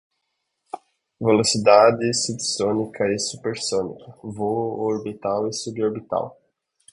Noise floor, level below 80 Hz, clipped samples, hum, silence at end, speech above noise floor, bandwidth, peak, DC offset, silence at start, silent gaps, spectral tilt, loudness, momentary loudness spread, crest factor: -76 dBFS; -60 dBFS; under 0.1%; none; 0.6 s; 55 dB; 11 kHz; 0 dBFS; under 0.1%; 0.75 s; none; -4 dB/octave; -21 LUFS; 20 LU; 22 dB